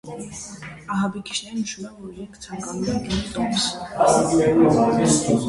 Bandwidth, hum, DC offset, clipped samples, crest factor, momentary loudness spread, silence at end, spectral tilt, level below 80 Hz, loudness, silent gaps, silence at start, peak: 11.5 kHz; none; under 0.1%; under 0.1%; 18 dB; 19 LU; 0 s; -4.5 dB/octave; -46 dBFS; -21 LUFS; none; 0.05 s; -4 dBFS